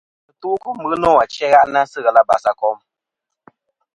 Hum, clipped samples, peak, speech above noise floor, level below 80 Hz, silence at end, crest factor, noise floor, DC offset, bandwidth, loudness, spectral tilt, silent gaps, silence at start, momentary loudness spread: none; under 0.1%; 0 dBFS; 66 dB; -52 dBFS; 1.2 s; 18 dB; -81 dBFS; under 0.1%; 10.5 kHz; -16 LUFS; -4.5 dB/octave; none; 0.45 s; 11 LU